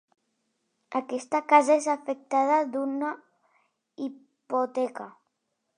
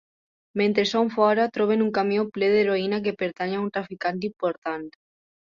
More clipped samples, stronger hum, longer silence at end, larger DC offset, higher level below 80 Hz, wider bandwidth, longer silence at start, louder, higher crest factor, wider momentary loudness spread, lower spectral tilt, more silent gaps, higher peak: neither; neither; first, 0.7 s vs 0.55 s; neither; second, -88 dBFS vs -66 dBFS; first, 10.5 kHz vs 7.4 kHz; first, 0.9 s vs 0.55 s; about the same, -26 LUFS vs -24 LUFS; about the same, 22 dB vs 18 dB; first, 17 LU vs 10 LU; second, -3.5 dB/octave vs -6 dB/octave; second, none vs 4.58-4.62 s; about the same, -6 dBFS vs -6 dBFS